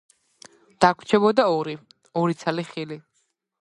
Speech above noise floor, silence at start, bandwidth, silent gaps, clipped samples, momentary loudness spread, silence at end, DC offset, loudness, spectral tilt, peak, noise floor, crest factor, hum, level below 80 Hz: 50 dB; 0.8 s; 11 kHz; none; under 0.1%; 16 LU; 0.65 s; under 0.1%; -22 LUFS; -6 dB/octave; -2 dBFS; -72 dBFS; 22 dB; none; -64 dBFS